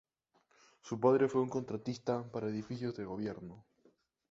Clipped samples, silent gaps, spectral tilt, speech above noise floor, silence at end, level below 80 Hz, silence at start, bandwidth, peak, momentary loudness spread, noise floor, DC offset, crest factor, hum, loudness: under 0.1%; none; -7 dB/octave; 40 dB; 0.7 s; -72 dBFS; 0.85 s; 7.8 kHz; -16 dBFS; 13 LU; -75 dBFS; under 0.1%; 22 dB; none; -36 LUFS